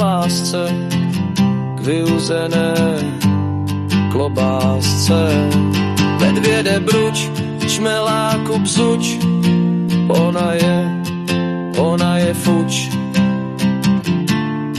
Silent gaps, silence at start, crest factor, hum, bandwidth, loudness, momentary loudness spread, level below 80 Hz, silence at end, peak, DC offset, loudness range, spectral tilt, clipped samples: none; 0 s; 12 dB; none; 14 kHz; -16 LUFS; 5 LU; -50 dBFS; 0 s; -4 dBFS; under 0.1%; 2 LU; -5.5 dB/octave; under 0.1%